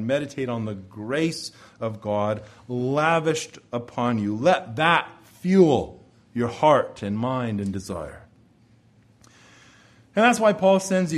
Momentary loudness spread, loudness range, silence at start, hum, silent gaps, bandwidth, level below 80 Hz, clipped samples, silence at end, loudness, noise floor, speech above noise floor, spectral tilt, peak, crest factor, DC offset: 15 LU; 6 LU; 0 s; none; none; 13 kHz; -58 dBFS; under 0.1%; 0 s; -23 LUFS; -57 dBFS; 34 dB; -5.5 dB/octave; -4 dBFS; 20 dB; under 0.1%